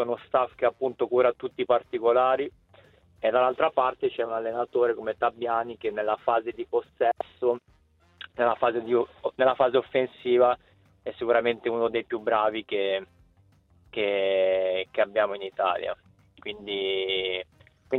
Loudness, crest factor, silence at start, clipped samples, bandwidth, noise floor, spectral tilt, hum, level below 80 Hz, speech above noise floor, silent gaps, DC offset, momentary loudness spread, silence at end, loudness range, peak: -26 LUFS; 18 dB; 0 s; under 0.1%; 4.2 kHz; -61 dBFS; -7 dB/octave; none; -66 dBFS; 35 dB; none; under 0.1%; 9 LU; 0 s; 3 LU; -8 dBFS